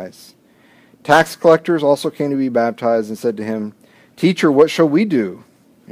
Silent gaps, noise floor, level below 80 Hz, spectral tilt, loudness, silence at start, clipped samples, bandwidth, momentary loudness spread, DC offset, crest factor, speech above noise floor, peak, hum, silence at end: none; -51 dBFS; -62 dBFS; -6 dB/octave; -16 LUFS; 0 s; under 0.1%; 16 kHz; 12 LU; under 0.1%; 16 dB; 35 dB; 0 dBFS; none; 0.55 s